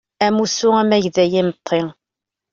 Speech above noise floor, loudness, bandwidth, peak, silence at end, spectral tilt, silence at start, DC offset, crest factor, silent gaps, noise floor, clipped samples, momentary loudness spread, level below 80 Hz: 69 dB; -17 LUFS; 7.6 kHz; -2 dBFS; 0.6 s; -4.5 dB/octave; 0.2 s; under 0.1%; 16 dB; none; -85 dBFS; under 0.1%; 6 LU; -56 dBFS